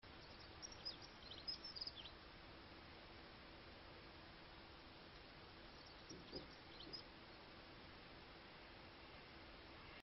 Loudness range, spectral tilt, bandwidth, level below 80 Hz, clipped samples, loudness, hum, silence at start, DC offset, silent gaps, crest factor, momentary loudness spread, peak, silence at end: 6 LU; -2 dB/octave; 6 kHz; -70 dBFS; under 0.1%; -56 LUFS; none; 0 s; under 0.1%; none; 22 dB; 10 LU; -38 dBFS; 0 s